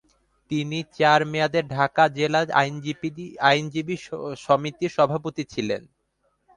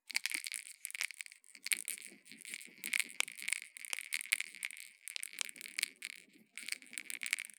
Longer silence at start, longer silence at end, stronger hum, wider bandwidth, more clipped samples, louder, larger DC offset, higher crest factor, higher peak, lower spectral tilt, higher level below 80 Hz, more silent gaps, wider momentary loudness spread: first, 0.5 s vs 0.1 s; first, 0.75 s vs 0.05 s; neither; second, 10.5 kHz vs over 20 kHz; neither; first, -23 LUFS vs -40 LUFS; neither; second, 20 dB vs 34 dB; first, -4 dBFS vs -8 dBFS; first, -5.5 dB/octave vs 3 dB/octave; first, -62 dBFS vs under -90 dBFS; neither; about the same, 11 LU vs 12 LU